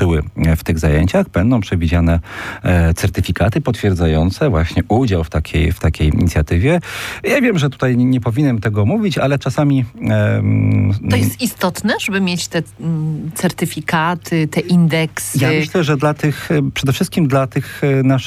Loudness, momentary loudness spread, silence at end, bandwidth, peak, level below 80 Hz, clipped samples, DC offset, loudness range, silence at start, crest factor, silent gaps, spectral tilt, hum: -16 LUFS; 5 LU; 0 s; 15.5 kHz; -2 dBFS; -28 dBFS; under 0.1%; under 0.1%; 2 LU; 0 s; 12 dB; none; -6.5 dB/octave; none